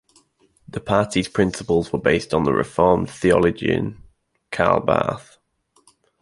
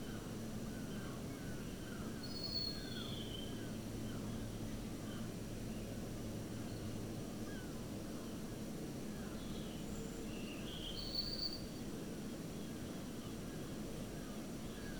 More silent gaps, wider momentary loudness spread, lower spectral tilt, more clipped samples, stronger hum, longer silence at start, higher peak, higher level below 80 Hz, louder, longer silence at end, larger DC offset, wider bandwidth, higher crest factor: neither; first, 11 LU vs 6 LU; about the same, -6 dB/octave vs -5 dB/octave; neither; neither; first, 0.75 s vs 0 s; first, -2 dBFS vs -28 dBFS; first, -44 dBFS vs -56 dBFS; first, -20 LUFS vs -45 LUFS; first, 1 s vs 0 s; second, under 0.1% vs 0.1%; second, 11.5 kHz vs over 20 kHz; about the same, 20 dB vs 16 dB